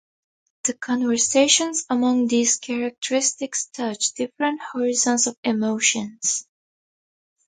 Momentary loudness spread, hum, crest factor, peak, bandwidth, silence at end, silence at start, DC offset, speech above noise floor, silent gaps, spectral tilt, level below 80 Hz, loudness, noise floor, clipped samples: 9 LU; none; 20 dB; -4 dBFS; 9.6 kHz; 1.05 s; 0.65 s; under 0.1%; over 68 dB; 2.98-3.02 s, 5.37-5.43 s; -1.5 dB/octave; -70 dBFS; -21 LUFS; under -90 dBFS; under 0.1%